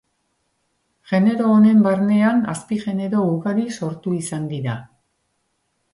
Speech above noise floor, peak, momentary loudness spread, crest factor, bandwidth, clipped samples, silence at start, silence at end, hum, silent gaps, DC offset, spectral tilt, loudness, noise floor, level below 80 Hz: 52 dB; -6 dBFS; 12 LU; 14 dB; 11.5 kHz; under 0.1%; 1.1 s; 1.1 s; none; none; under 0.1%; -7 dB/octave; -19 LUFS; -70 dBFS; -62 dBFS